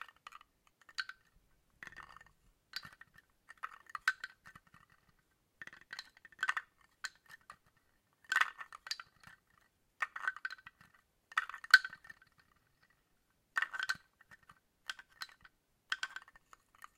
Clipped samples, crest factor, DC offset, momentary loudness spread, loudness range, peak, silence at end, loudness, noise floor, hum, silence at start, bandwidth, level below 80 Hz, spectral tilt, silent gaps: under 0.1%; 36 dB; under 0.1%; 23 LU; 10 LU; -6 dBFS; 0.8 s; -38 LUFS; -77 dBFS; none; 1 s; 16 kHz; -80 dBFS; 1.5 dB/octave; none